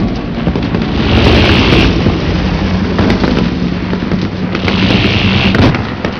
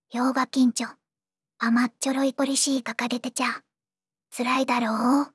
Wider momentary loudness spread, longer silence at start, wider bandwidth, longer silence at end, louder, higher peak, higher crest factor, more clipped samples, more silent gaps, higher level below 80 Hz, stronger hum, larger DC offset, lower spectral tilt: about the same, 8 LU vs 8 LU; about the same, 0 s vs 0.1 s; second, 5.4 kHz vs 12 kHz; about the same, 0 s vs 0.05 s; first, -11 LUFS vs -24 LUFS; first, 0 dBFS vs -10 dBFS; second, 10 dB vs 16 dB; first, 0.3% vs under 0.1%; neither; first, -20 dBFS vs -90 dBFS; neither; first, 0.9% vs under 0.1%; first, -7 dB/octave vs -2.5 dB/octave